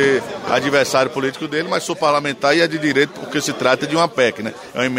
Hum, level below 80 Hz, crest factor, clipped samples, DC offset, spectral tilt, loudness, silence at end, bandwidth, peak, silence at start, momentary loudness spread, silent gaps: none; -60 dBFS; 18 dB; under 0.1%; under 0.1%; -4 dB/octave; -18 LUFS; 0 s; 16 kHz; 0 dBFS; 0 s; 6 LU; none